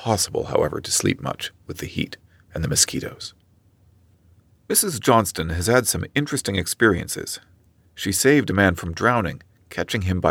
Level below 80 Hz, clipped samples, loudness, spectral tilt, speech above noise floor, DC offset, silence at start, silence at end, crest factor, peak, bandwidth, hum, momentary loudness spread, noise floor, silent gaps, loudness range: -44 dBFS; under 0.1%; -21 LUFS; -3.5 dB/octave; 36 dB; under 0.1%; 0 s; 0 s; 20 dB; -2 dBFS; 18.5 kHz; none; 14 LU; -58 dBFS; none; 4 LU